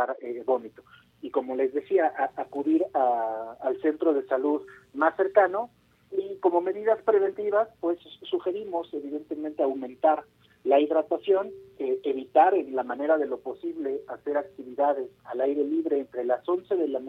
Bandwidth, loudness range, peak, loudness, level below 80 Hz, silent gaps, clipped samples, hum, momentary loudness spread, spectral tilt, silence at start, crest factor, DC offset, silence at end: 4.2 kHz; 3 LU; -6 dBFS; -27 LUFS; -74 dBFS; none; under 0.1%; none; 11 LU; -7 dB/octave; 0 s; 20 dB; under 0.1%; 0 s